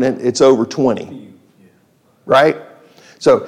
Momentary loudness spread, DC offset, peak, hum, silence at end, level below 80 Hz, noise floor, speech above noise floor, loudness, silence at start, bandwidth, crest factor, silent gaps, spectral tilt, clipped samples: 16 LU; under 0.1%; -2 dBFS; none; 0 s; -58 dBFS; -55 dBFS; 42 dB; -14 LUFS; 0 s; 12.5 kHz; 14 dB; none; -5 dB/octave; under 0.1%